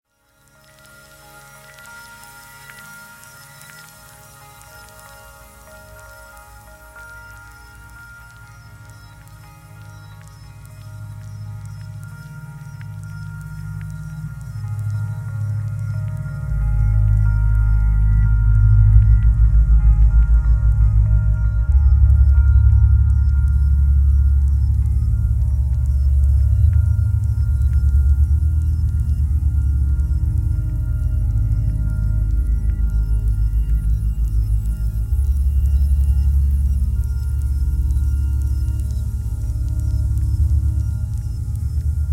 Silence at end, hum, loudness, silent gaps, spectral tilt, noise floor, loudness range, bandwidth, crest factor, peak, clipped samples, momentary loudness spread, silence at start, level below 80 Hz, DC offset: 0 s; none; -19 LUFS; none; -8 dB/octave; -57 dBFS; 24 LU; 11 kHz; 16 dB; 0 dBFS; under 0.1%; 23 LU; 1.8 s; -18 dBFS; under 0.1%